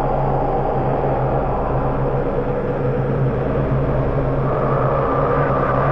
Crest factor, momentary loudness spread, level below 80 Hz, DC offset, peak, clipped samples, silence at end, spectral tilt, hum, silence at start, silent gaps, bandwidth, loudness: 12 dB; 3 LU; -28 dBFS; 1%; -6 dBFS; under 0.1%; 0 s; -10.5 dB/octave; none; 0 s; none; 5.4 kHz; -19 LUFS